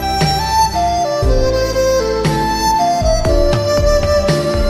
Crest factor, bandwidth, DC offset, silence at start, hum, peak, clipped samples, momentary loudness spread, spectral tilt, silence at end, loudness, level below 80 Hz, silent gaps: 12 dB; 16 kHz; under 0.1%; 0 s; none; -2 dBFS; under 0.1%; 2 LU; -5 dB/octave; 0 s; -14 LUFS; -20 dBFS; none